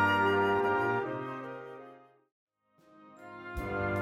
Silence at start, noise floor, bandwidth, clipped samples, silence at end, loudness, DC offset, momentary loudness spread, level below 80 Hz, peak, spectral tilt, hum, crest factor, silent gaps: 0 s; -65 dBFS; 15.5 kHz; under 0.1%; 0 s; -31 LUFS; under 0.1%; 22 LU; -54 dBFS; -16 dBFS; -6.5 dB/octave; none; 16 dB; 2.32-2.47 s